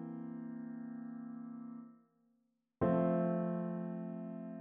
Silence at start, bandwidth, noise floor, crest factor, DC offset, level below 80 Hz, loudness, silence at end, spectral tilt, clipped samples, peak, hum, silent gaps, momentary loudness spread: 0 s; 3.4 kHz; -80 dBFS; 20 dB; under 0.1%; -70 dBFS; -39 LUFS; 0 s; -10 dB/octave; under 0.1%; -20 dBFS; none; none; 15 LU